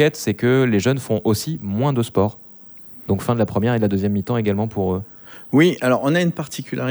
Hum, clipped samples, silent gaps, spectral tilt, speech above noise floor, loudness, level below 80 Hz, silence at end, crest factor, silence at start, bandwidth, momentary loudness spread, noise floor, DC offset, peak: none; under 0.1%; none; -6.5 dB/octave; 22 dB; -20 LUFS; -54 dBFS; 0 s; 16 dB; 0 s; over 20 kHz; 15 LU; -41 dBFS; under 0.1%; -4 dBFS